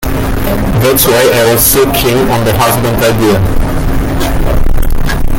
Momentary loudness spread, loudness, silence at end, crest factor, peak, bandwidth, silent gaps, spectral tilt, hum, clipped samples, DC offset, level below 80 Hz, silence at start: 8 LU; -10 LUFS; 0 s; 8 dB; 0 dBFS; 17.5 kHz; none; -4.5 dB/octave; none; 0.1%; under 0.1%; -14 dBFS; 0 s